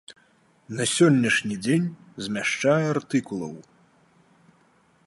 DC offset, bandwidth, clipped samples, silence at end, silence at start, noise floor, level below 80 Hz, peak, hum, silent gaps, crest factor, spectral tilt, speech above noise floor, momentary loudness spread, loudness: under 0.1%; 11.5 kHz; under 0.1%; 1.45 s; 0.1 s; -61 dBFS; -66 dBFS; -6 dBFS; none; none; 20 dB; -5 dB/octave; 38 dB; 17 LU; -23 LUFS